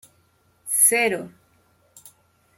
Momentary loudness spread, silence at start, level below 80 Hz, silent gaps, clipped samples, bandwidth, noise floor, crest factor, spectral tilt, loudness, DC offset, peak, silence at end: 25 LU; 0.65 s; -74 dBFS; none; under 0.1%; 16.5 kHz; -62 dBFS; 24 dB; -1 dB/octave; -18 LUFS; under 0.1%; -2 dBFS; 0.5 s